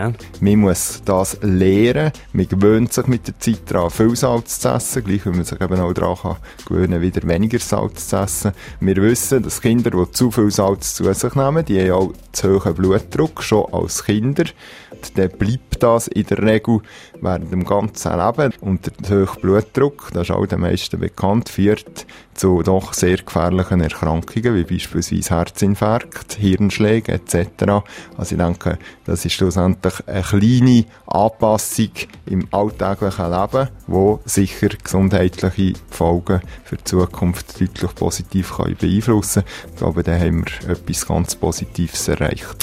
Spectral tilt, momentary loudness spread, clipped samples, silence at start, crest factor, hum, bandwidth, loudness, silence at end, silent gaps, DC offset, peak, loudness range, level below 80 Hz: -6 dB/octave; 7 LU; under 0.1%; 0 s; 16 dB; none; 16 kHz; -18 LUFS; 0 s; none; under 0.1%; 0 dBFS; 3 LU; -36 dBFS